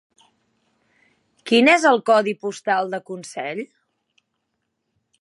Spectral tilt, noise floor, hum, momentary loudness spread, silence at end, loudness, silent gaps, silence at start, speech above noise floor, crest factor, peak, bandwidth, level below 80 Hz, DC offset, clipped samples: -3.5 dB/octave; -76 dBFS; none; 19 LU; 1.55 s; -19 LUFS; none; 1.45 s; 57 dB; 20 dB; -2 dBFS; 11.5 kHz; -80 dBFS; under 0.1%; under 0.1%